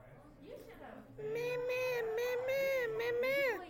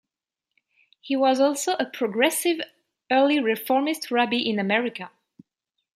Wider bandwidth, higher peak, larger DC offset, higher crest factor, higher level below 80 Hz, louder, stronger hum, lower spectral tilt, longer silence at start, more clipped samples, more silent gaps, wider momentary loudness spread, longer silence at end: first, 17 kHz vs 14.5 kHz; second, -24 dBFS vs -4 dBFS; neither; second, 14 dB vs 20 dB; first, -66 dBFS vs -78 dBFS; second, -36 LUFS vs -23 LUFS; neither; about the same, -4 dB/octave vs -3.5 dB/octave; second, 0 s vs 1.05 s; neither; neither; first, 19 LU vs 10 LU; second, 0 s vs 0.9 s